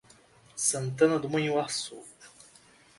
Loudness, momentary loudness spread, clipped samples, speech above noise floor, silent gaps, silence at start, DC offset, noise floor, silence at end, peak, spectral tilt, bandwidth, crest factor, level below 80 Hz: -28 LUFS; 20 LU; under 0.1%; 30 dB; none; 0.55 s; under 0.1%; -58 dBFS; 0.7 s; -10 dBFS; -4 dB/octave; 12 kHz; 20 dB; -70 dBFS